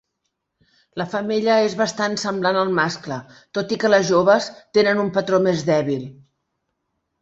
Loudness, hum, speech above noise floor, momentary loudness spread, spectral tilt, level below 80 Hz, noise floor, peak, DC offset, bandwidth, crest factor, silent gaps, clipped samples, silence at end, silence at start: -20 LUFS; none; 57 dB; 13 LU; -5 dB/octave; -62 dBFS; -76 dBFS; -2 dBFS; under 0.1%; 8.2 kHz; 18 dB; none; under 0.1%; 1.1 s; 0.95 s